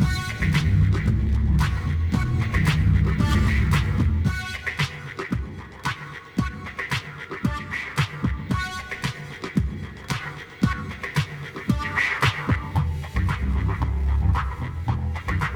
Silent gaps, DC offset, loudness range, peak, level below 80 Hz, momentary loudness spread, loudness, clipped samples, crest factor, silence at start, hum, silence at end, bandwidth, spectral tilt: none; under 0.1%; 7 LU; -6 dBFS; -28 dBFS; 10 LU; -25 LUFS; under 0.1%; 16 dB; 0 s; none; 0 s; 16.5 kHz; -6 dB/octave